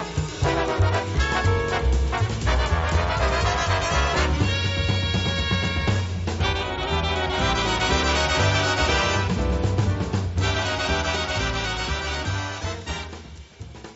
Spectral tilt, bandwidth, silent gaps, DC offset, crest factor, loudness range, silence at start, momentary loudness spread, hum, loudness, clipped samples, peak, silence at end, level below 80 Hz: -3.5 dB/octave; 8 kHz; none; under 0.1%; 14 dB; 3 LU; 0 s; 7 LU; none; -23 LUFS; under 0.1%; -8 dBFS; 0 s; -30 dBFS